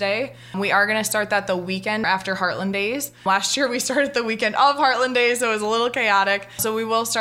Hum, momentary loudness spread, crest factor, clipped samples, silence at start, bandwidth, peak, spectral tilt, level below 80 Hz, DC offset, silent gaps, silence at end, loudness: none; 6 LU; 18 dB; under 0.1%; 0 s; 16 kHz; -4 dBFS; -2.5 dB/octave; -62 dBFS; under 0.1%; none; 0 s; -20 LUFS